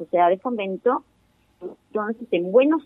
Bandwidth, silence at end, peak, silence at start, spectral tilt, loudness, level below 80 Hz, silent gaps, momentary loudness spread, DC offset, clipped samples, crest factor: 3.8 kHz; 0.05 s; -4 dBFS; 0 s; -8.5 dB/octave; -23 LUFS; -72 dBFS; none; 20 LU; under 0.1%; under 0.1%; 18 dB